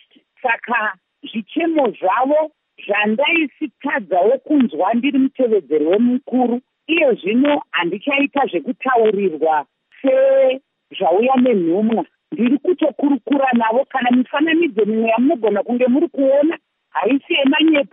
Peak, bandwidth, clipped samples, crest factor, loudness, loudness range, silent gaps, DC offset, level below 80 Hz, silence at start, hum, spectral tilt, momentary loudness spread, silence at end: -4 dBFS; 3.8 kHz; under 0.1%; 12 dB; -17 LUFS; 1 LU; none; under 0.1%; -78 dBFS; 0.45 s; none; -3 dB/octave; 8 LU; 0.05 s